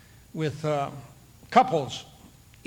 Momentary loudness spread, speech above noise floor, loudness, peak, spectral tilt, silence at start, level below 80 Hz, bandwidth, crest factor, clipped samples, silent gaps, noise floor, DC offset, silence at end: 18 LU; 27 dB; -26 LUFS; -4 dBFS; -5.5 dB/octave; 0.35 s; -60 dBFS; 19.5 kHz; 24 dB; under 0.1%; none; -52 dBFS; under 0.1%; 0.4 s